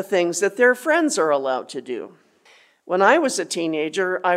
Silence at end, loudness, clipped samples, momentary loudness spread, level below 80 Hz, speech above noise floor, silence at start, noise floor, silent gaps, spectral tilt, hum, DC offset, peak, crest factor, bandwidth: 0 s; -20 LUFS; under 0.1%; 14 LU; -82 dBFS; 34 dB; 0 s; -55 dBFS; none; -3 dB/octave; none; under 0.1%; -2 dBFS; 18 dB; 15.5 kHz